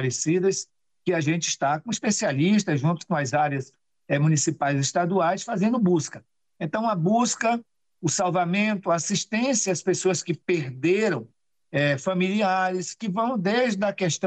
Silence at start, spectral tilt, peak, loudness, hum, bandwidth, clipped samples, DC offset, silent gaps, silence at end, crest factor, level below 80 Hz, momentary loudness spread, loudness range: 0 s; -4.5 dB/octave; -12 dBFS; -24 LUFS; none; 9.4 kHz; under 0.1%; under 0.1%; none; 0 s; 12 dB; -68 dBFS; 7 LU; 1 LU